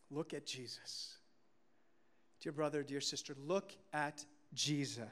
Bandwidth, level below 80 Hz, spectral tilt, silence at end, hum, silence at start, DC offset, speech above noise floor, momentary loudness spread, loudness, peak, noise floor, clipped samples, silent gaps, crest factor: 15 kHz; -88 dBFS; -3.5 dB/octave; 0 s; none; 0.1 s; under 0.1%; 35 dB; 11 LU; -42 LUFS; -24 dBFS; -78 dBFS; under 0.1%; none; 20 dB